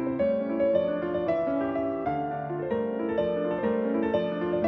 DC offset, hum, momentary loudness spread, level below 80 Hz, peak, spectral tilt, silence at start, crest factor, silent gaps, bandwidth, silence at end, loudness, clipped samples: under 0.1%; none; 4 LU; -56 dBFS; -12 dBFS; -9.5 dB/octave; 0 s; 16 dB; none; 6 kHz; 0 s; -28 LUFS; under 0.1%